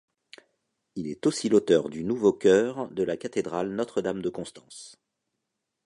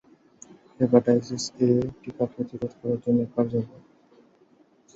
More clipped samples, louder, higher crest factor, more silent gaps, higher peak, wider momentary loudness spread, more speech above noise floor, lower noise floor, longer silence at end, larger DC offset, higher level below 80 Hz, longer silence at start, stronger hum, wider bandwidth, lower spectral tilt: neither; about the same, -26 LUFS vs -25 LUFS; about the same, 20 dB vs 22 dB; neither; second, -8 dBFS vs -4 dBFS; first, 19 LU vs 12 LU; first, 57 dB vs 35 dB; first, -83 dBFS vs -60 dBFS; second, 0.95 s vs 1.3 s; neither; about the same, -64 dBFS vs -60 dBFS; first, 0.95 s vs 0.8 s; neither; first, 11.5 kHz vs 8 kHz; second, -5.5 dB/octave vs -7 dB/octave